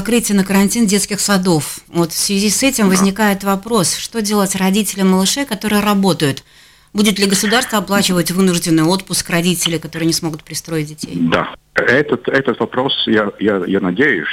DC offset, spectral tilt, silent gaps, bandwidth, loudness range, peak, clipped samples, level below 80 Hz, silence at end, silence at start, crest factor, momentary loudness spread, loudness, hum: under 0.1%; -4 dB/octave; none; 16.5 kHz; 3 LU; -2 dBFS; under 0.1%; -46 dBFS; 0 s; 0 s; 12 dB; 6 LU; -15 LUFS; none